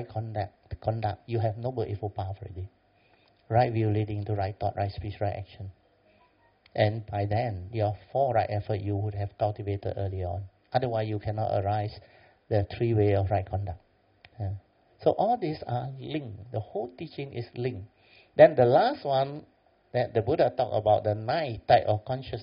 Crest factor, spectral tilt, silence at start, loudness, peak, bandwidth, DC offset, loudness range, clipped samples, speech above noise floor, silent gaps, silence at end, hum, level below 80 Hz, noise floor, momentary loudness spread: 24 dB; -6.5 dB/octave; 0 s; -28 LUFS; -4 dBFS; 5.4 kHz; under 0.1%; 7 LU; under 0.1%; 36 dB; none; 0 s; none; -56 dBFS; -64 dBFS; 14 LU